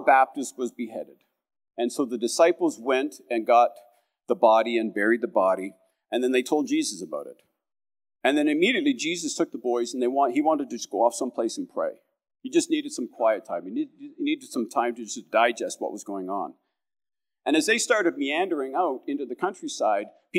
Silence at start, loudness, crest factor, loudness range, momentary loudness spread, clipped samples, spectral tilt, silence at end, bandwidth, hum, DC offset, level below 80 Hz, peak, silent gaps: 0 s; -25 LUFS; 20 dB; 5 LU; 12 LU; under 0.1%; -3 dB/octave; 0 s; 15.5 kHz; none; under 0.1%; under -90 dBFS; -6 dBFS; none